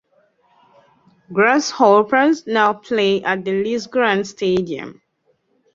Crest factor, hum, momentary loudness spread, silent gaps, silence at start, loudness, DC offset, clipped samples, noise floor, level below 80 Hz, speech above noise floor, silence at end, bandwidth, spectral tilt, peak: 18 dB; none; 9 LU; none; 1.3 s; -17 LUFS; under 0.1%; under 0.1%; -64 dBFS; -60 dBFS; 48 dB; 0.85 s; 7.6 kHz; -4.5 dB/octave; -2 dBFS